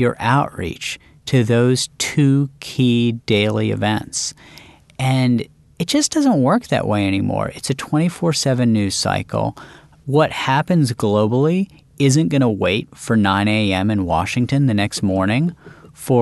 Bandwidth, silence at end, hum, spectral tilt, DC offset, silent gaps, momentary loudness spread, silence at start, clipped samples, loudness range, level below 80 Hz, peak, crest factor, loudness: 12.5 kHz; 0 s; none; -5.5 dB/octave; under 0.1%; none; 8 LU; 0 s; under 0.1%; 2 LU; -48 dBFS; -2 dBFS; 16 dB; -18 LUFS